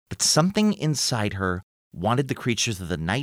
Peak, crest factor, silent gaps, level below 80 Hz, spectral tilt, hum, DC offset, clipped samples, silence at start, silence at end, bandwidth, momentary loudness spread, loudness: -6 dBFS; 18 dB; 1.63-1.91 s; -50 dBFS; -4 dB/octave; none; under 0.1%; under 0.1%; 0.1 s; 0 s; over 20 kHz; 9 LU; -23 LUFS